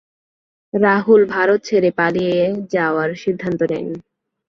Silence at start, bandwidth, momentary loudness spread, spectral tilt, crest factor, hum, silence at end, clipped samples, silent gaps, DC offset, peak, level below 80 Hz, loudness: 0.75 s; 7 kHz; 11 LU; -6.5 dB/octave; 16 dB; none; 0.5 s; under 0.1%; none; under 0.1%; -2 dBFS; -58 dBFS; -17 LUFS